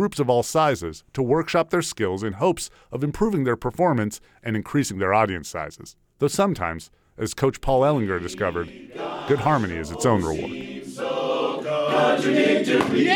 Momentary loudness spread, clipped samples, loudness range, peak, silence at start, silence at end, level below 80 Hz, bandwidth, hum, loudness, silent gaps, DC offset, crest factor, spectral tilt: 12 LU; under 0.1%; 2 LU; -4 dBFS; 0 s; 0 s; -46 dBFS; 19.5 kHz; none; -23 LUFS; none; under 0.1%; 20 dB; -5.5 dB/octave